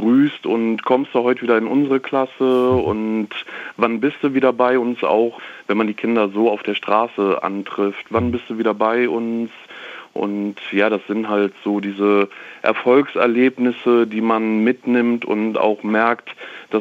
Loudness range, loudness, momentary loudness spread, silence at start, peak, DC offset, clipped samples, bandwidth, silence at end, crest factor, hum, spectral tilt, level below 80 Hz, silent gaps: 4 LU; -18 LUFS; 8 LU; 0 s; -2 dBFS; under 0.1%; under 0.1%; 7.6 kHz; 0 s; 16 dB; none; -7.5 dB/octave; -60 dBFS; none